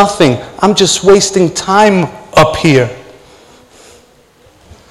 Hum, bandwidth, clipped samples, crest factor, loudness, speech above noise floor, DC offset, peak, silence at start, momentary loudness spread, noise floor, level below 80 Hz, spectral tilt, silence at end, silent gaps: none; 14.5 kHz; 1%; 12 dB; -10 LUFS; 36 dB; under 0.1%; 0 dBFS; 0 s; 5 LU; -45 dBFS; -40 dBFS; -4.5 dB/octave; 1.9 s; none